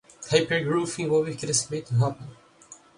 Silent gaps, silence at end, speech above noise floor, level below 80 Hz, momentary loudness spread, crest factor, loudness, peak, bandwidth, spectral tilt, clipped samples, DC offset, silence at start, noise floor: none; 0.25 s; 26 dB; -62 dBFS; 5 LU; 22 dB; -25 LUFS; -6 dBFS; 11 kHz; -4.5 dB/octave; under 0.1%; under 0.1%; 0.2 s; -51 dBFS